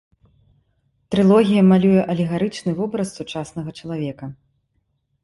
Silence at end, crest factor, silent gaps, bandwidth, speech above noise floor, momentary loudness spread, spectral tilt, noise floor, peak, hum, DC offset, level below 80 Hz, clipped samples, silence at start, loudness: 0.9 s; 16 dB; none; 11.5 kHz; 51 dB; 16 LU; -7.5 dB/octave; -69 dBFS; -4 dBFS; none; under 0.1%; -54 dBFS; under 0.1%; 1.1 s; -19 LUFS